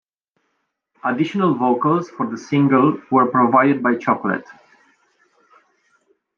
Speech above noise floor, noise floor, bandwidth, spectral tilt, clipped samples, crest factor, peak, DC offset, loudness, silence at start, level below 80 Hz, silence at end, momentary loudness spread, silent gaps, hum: 55 dB; -72 dBFS; 7 kHz; -8 dB/octave; under 0.1%; 18 dB; -2 dBFS; under 0.1%; -18 LUFS; 1.05 s; -70 dBFS; 1.85 s; 10 LU; none; none